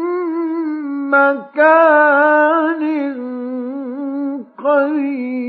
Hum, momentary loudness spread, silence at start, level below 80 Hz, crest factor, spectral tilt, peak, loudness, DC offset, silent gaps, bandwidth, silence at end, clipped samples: none; 14 LU; 0 s; -84 dBFS; 14 dB; -7 dB/octave; -2 dBFS; -15 LUFS; under 0.1%; none; 4.8 kHz; 0 s; under 0.1%